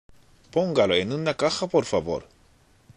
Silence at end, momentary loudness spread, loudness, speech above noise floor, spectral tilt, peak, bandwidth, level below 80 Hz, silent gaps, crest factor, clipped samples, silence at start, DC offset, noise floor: 0.7 s; 8 LU; -24 LUFS; 35 dB; -5 dB/octave; -6 dBFS; 11 kHz; -56 dBFS; none; 20 dB; under 0.1%; 0.55 s; under 0.1%; -58 dBFS